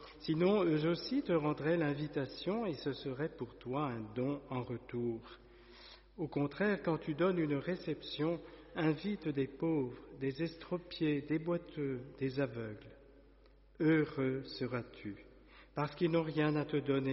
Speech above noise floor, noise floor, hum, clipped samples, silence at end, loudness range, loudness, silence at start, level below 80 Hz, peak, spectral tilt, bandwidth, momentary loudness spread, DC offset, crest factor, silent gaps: 27 dB; -63 dBFS; none; under 0.1%; 0 s; 4 LU; -37 LUFS; 0 s; -64 dBFS; -20 dBFS; -6 dB/octave; 5.8 kHz; 12 LU; under 0.1%; 16 dB; none